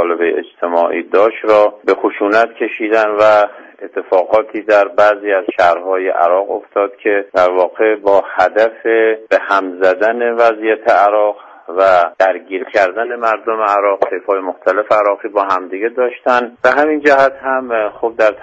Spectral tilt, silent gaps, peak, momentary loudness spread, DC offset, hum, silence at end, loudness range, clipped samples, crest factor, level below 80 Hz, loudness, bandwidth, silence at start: -4.5 dB/octave; none; 0 dBFS; 7 LU; under 0.1%; none; 0 s; 2 LU; under 0.1%; 14 dB; -58 dBFS; -13 LUFS; 8 kHz; 0 s